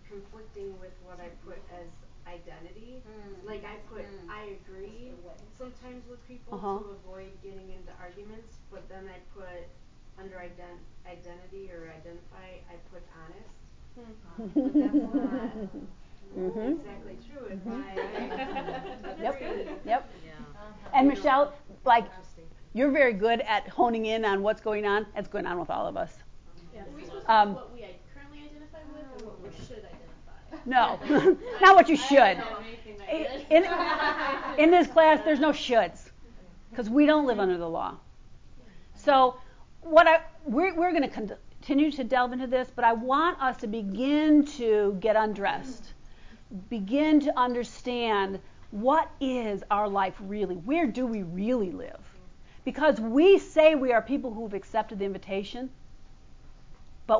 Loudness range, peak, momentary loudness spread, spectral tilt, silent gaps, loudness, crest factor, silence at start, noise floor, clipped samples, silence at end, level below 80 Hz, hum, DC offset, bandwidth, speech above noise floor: 22 LU; -6 dBFS; 26 LU; -5.5 dB/octave; none; -25 LUFS; 22 dB; 0.05 s; -48 dBFS; under 0.1%; 0 s; -52 dBFS; none; under 0.1%; 7.6 kHz; 21 dB